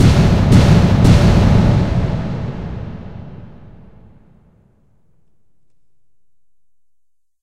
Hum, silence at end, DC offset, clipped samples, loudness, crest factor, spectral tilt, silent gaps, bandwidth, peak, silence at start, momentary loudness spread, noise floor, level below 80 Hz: none; 3.95 s; under 0.1%; under 0.1%; -13 LUFS; 16 dB; -7.5 dB/octave; none; 12 kHz; 0 dBFS; 0 s; 22 LU; -72 dBFS; -24 dBFS